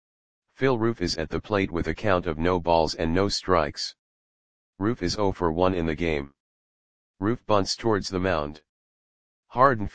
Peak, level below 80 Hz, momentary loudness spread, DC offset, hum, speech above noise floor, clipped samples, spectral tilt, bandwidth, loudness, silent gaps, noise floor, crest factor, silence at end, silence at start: -2 dBFS; -44 dBFS; 7 LU; 0.9%; none; over 65 dB; under 0.1%; -5.5 dB/octave; 9.8 kHz; -25 LUFS; 3.99-4.73 s, 6.40-7.14 s, 8.69-9.43 s; under -90 dBFS; 24 dB; 0 s; 0.4 s